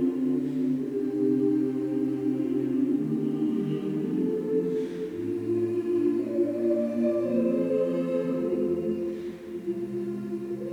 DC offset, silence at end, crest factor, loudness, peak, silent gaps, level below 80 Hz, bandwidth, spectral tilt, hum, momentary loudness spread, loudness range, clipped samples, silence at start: under 0.1%; 0 s; 12 dB; -28 LUFS; -14 dBFS; none; -66 dBFS; 11 kHz; -9 dB/octave; none; 7 LU; 2 LU; under 0.1%; 0 s